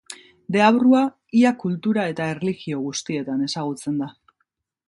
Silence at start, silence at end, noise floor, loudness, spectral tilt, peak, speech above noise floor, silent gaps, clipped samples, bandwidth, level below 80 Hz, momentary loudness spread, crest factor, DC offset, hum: 0.1 s; 0.75 s; -74 dBFS; -21 LUFS; -5.5 dB/octave; -2 dBFS; 53 dB; none; under 0.1%; 11.5 kHz; -66 dBFS; 11 LU; 20 dB; under 0.1%; none